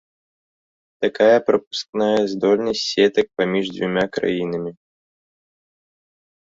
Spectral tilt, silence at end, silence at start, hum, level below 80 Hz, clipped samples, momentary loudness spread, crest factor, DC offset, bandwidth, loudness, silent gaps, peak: -5 dB/octave; 1.75 s; 1 s; none; -60 dBFS; under 0.1%; 10 LU; 18 dB; under 0.1%; 7.8 kHz; -20 LUFS; 1.67-1.71 s, 1.89-1.93 s; -2 dBFS